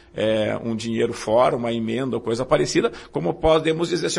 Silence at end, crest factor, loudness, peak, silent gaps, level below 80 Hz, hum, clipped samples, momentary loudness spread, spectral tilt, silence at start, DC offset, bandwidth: 0 s; 16 dB; -22 LUFS; -6 dBFS; none; -44 dBFS; none; under 0.1%; 7 LU; -5 dB/octave; 0.15 s; under 0.1%; 11.5 kHz